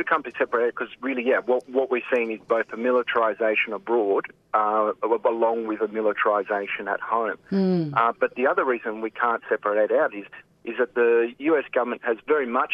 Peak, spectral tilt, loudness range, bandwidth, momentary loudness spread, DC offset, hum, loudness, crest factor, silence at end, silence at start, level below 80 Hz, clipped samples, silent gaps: -6 dBFS; -8 dB/octave; 1 LU; 5.6 kHz; 5 LU; under 0.1%; none; -24 LUFS; 18 dB; 0 s; 0 s; -72 dBFS; under 0.1%; none